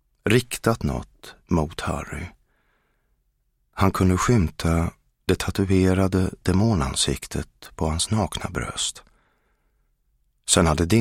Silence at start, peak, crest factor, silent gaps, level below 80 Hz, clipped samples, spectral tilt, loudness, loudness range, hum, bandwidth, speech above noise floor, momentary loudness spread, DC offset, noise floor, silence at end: 0.25 s; -4 dBFS; 20 dB; none; -38 dBFS; under 0.1%; -5 dB/octave; -23 LUFS; 7 LU; none; 16.5 kHz; 47 dB; 13 LU; under 0.1%; -69 dBFS; 0 s